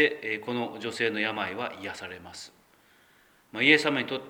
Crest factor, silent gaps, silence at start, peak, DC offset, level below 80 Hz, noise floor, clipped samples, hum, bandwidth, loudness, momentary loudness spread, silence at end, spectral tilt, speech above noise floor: 26 dB; none; 0 s; -4 dBFS; under 0.1%; -72 dBFS; -61 dBFS; under 0.1%; none; 20 kHz; -27 LUFS; 21 LU; 0 s; -4 dB/octave; 33 dB